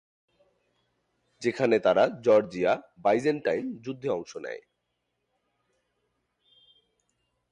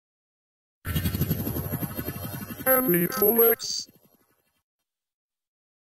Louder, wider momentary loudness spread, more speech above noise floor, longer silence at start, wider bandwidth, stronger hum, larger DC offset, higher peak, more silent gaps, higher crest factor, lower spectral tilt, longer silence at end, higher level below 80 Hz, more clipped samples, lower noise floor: about the same, -26 LUFS vs -24 LUFS; about the same, 15 LU vs 15 LU; first, 54 dB vs 46 dB; first, 1.4 s vs 0.85 s; second, 10 kHz vs 16 kHz; first, 60 Hz at -65 dBFS vs none; neither; second, -10 dBFS vs -6 dBFS; neither; about the same, 20 dB vs 22 dB; first, -6 dB/octave vs -4.5 dB/octave; first, 2.95 s vs 2.05 s; second, -70 dBFS vs -46 dBFS; neither; first, -79 dBFS vs -69 dBFS